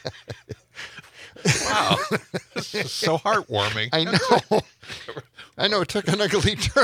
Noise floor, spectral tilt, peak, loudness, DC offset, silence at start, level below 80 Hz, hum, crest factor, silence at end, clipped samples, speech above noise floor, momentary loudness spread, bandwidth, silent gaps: -44 dBFS; -4 dB/octave; -4 dBFS; -22 LUFS; under 0.1%; 0.05 s; -48 dBFS; none; 20 dB; 0 s; under 0.1%; 22 dB; 19 LU; 16.5 kHz; none